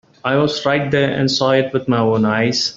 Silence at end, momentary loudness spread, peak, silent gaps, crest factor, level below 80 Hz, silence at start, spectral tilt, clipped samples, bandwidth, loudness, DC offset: 0 s; 2 LU; -2 dBFS; none; 14 dB; -54 dBFS; 0.25 s; -5 dB/octave; under 0.1%; 7.8 kHz; -16 LUFS; under 0.1%